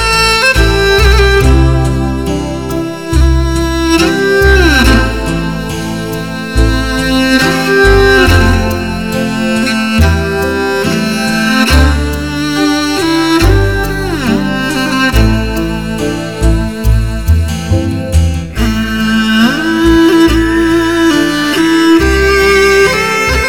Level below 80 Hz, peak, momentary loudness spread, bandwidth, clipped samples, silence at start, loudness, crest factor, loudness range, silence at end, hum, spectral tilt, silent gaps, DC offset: -16 dBFS; 0 dBFS; 9 LU; 18 kHz; 0.3%; 0 s; -10 LUFS; 10 dB; 4 LU; 0 s; none; -5 dB/octave; none; 1%